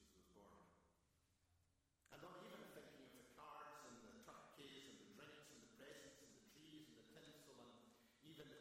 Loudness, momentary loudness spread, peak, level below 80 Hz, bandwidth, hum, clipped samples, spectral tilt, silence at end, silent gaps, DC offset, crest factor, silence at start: -63 LUFS; 6 LU; -44 dBFS; -86 dBFS; 16 kHz; none; under 0.1%; -3.5 dB/octave; 0 s; none; under 0.1%; 22 dB; 0 s